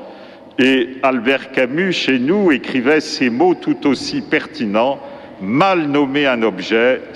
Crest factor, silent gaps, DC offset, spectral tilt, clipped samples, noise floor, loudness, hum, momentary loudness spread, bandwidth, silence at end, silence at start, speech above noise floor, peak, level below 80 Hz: 14 dB; none; under 0.1%; -5 dB/octave; under 0.1%; -37 dBFS; -16 LUFS; none; 6 LU; 11 kHz; 0 s; 0 s; 22 dB; -2 dBFS; -58 dBFS